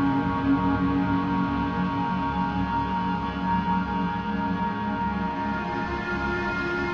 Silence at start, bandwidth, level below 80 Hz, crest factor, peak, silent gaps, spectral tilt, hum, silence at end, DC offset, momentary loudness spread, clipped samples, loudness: 0 s; 7 kHz; -40 dBFS; 14 dB; -12 dBFS; none; -8 dB/octave; none; 0 s; under 0.1%; 4 LU; under 0.1%; -26 LUFS